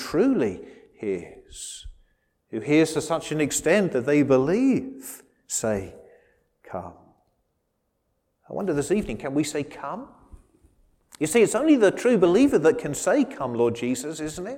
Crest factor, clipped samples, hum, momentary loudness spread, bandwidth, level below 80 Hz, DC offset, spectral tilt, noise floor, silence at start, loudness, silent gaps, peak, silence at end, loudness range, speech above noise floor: 16 dB; under 0.1%; none; 18 LU; 16.5 kHz; -54 dBFS; under 0.1%; -5 dB/octave; -74 dBFS; 0 s; -23 LUFS; none; -8 dBFS; 0 s; 12 LU; 51 dB